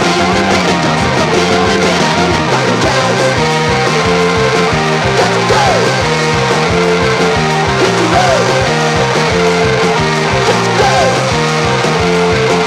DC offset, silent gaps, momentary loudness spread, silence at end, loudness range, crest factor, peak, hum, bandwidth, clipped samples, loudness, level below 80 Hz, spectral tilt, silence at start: under 0.1%; none; 2 LU; 0 s; 0 LU; 10 dB; 0 dBFS; none; 14.5 kHz; under 0.1%; -11 LUFS; -32 dBFS; -4.5 dB/octave; 0 s